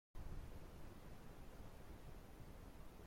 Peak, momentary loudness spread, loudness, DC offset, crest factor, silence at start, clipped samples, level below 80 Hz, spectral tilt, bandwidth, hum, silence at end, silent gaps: -40 dBFS; 4 LU; -59 LUFS; under 0.1%; 14 dB; 0.15 s; under 0.1%; -58 dBFS; -6 dB/octave; 16.5 kHz; none; 0 s; none